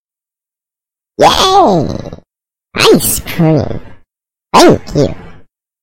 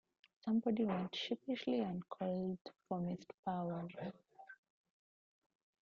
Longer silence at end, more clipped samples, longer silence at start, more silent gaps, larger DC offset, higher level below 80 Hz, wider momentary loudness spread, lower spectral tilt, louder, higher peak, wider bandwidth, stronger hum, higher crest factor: second, 0.4 s vs 1.35 s; first, 0.2% vs under 0.1%; first, 1.2 s vs 0.45 s; second, none vs 2.61-2.65 s, 3.34-3.43 s; neither; first, -36 dBFS vs -80 dBFS; first, 19 LU vs 13 LU; about the same, -4.5 dB/octave vs -5.5 dB/octave; first, -9 LUFS vs -41 LUFS; first, 0 dBFS vs -24 dBFS; first, 17.5 kHz vs 7.2 kHz; neither; second, 12 dB vs 18 dB